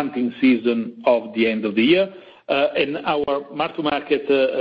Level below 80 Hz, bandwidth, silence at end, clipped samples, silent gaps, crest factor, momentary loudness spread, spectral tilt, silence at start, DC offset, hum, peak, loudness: -60 dBFS; 5.2 kHz; 0 s; under 0.1%; none; 16 dB; 7 LU; -8 dB/octave; 0 s; under 0.1%; none; -4 dBFS; -20 LUFS